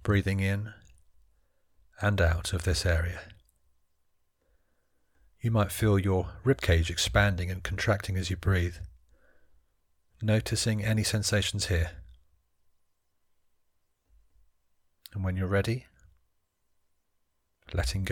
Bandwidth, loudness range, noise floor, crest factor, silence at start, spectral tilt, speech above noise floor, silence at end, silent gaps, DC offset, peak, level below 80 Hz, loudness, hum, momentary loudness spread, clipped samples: 17.5 kHz; 8 LU; -74 dBFS; 22 dB; 0.05 s; -5 dB/octave; 47 dB; 0 s; none; under 0.1%; -8 dBFS; -42 dBFS; -29 LUFS; none; 10 LU; under 0.1%